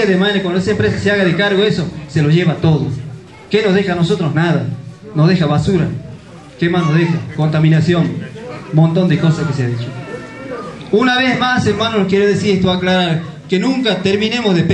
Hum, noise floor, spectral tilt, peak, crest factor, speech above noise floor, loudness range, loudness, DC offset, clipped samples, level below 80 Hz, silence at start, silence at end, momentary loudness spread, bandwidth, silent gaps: none; -34 dBFS; -6.5 dB/octave; 0 dBFS; 14 dB; 21 dB; 2 LU; -14 LUFS; 0.1%; under 0.1%; -44 dBFS; 0 s; 0 s; 14 LU; 9 kHz; none